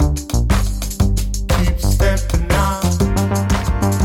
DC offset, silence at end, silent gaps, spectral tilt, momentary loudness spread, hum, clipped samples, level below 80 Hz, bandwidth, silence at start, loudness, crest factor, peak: under 0.1%; 0 s; none; -5.5 dB/octave; 3 LU; none; under 0.1%; -18 dBFS; 17 kHz; 0 s; -18 LUFS; 10 dB; -4 dBFS